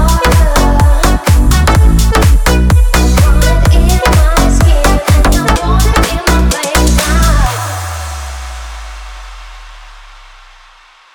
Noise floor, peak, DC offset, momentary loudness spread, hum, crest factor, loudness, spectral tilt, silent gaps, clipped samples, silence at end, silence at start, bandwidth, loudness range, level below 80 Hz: -41 dBFS; 0 dBFS; under 0.1%; 15 LU; none; 8 dB; -10 LUFS; -5 dB/octave; none; under 0.1%; 1.2 s; 0 s; 19.5 kHz; 11 LU; -10 dBFS